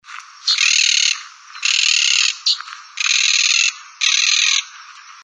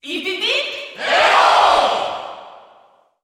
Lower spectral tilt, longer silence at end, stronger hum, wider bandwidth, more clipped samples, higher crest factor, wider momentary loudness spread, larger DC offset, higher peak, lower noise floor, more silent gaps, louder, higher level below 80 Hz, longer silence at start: second, 13 dB/octave vs -1 dB/octave; second, 0.05 s vs 0.65 s; neither; second, 11.5 kHz vs 16 kHz; neither; about the same, 18 dB vs 16 dB; second, 9 LU vs 14 LU; neither; about the same, 0 dBFS vs -2 dBFS; second, -39 dBFS vs -53 dBFS; neither; about the same, -14 LUFS vs -15 LUFS; second, under -90 dBFS vs -54 dBFS; about the same, 0.1 s vs 0.05 s